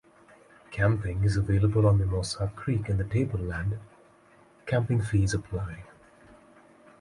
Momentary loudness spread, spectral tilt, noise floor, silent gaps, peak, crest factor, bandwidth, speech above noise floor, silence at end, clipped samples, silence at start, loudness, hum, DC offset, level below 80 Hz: 13 LU; -7 dB/octave; -58 dBFS; none; -12 dBFS; 16 dB; 11.5 kHz; 32 dB; 1.15 s; under 0.1%; 0.7 s; -28 LUFS; none; under 0.1%; -42 dBFS